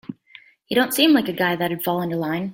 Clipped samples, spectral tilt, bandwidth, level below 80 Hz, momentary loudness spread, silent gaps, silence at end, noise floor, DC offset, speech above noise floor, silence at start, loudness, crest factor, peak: under 0.1%; -4.5 dB/octave; 17 kHz; -62 dBFS; 8 LU; none; 0 s; -50 dBFS; under 0.1%; 29 dB; 0.1 s; -20 LUFS; 18 dB; -4 dBFS